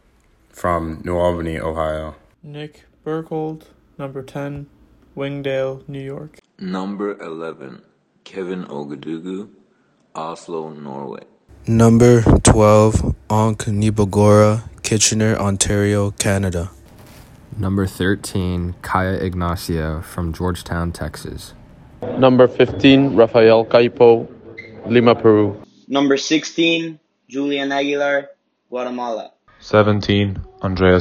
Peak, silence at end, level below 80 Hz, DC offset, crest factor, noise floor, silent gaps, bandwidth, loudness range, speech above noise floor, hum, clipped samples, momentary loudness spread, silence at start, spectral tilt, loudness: 0 dBFS; 0 s; -38 dBFS; under 0.1%; 18 dB; -59 dBFS; none; 15.5 kHz; 15 LU; 42 dB; none; under 0.1%; 21 LU; 0.55 s; -5.5 dB/octave; -17 LUFS